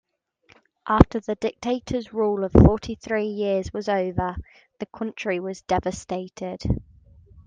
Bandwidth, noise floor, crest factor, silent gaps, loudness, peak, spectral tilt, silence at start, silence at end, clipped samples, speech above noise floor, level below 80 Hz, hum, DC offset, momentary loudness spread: 9.4 kHz; -60 dBFS; 24 dB; none; -24 LUFS; 0 dBFS; -7.5 dB/octave; 0.85 s; 0.05 s; under 0.1%; 37 dB; -34 dBFS; none; under 0.1%; 14 LU